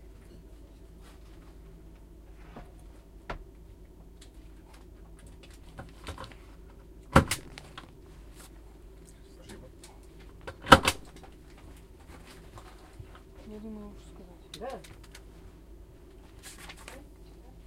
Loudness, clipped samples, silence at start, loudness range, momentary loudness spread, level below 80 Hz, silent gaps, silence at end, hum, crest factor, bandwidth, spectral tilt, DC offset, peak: -27 LUFS; under 0.1%; 0 s; 21 LU; 21 LU; -48 dBFS; none; 0 s; none; 36 dB; 16 kHz; -4 dB/octave; under 0.1%; 0 dBFS